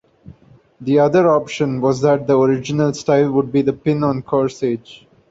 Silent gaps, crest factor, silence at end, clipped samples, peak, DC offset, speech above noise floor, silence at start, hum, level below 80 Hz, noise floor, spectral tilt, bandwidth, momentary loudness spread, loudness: none; 16 dB; 0.35 s; under 0.1%; -2 dBFS; under 0.1%; 30 dB; 0.25 s; none; -54 dBFS; -46 dBFS; -7 dB/octave; 8 kHz; 7 LU; -17 LUFS